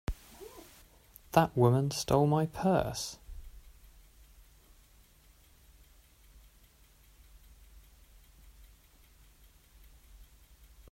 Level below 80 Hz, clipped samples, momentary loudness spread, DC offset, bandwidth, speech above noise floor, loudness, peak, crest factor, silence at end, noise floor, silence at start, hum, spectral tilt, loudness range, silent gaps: -52 dBFS; under 0.1%; 26 LU; under 0.1%; 16 kHz; 34 dB; -29 LUFS; -10 dBFS; 26 dB; 0.7 s; -62 dBFS; 0.1 s; none; -6 dB/octave; 9 LU; none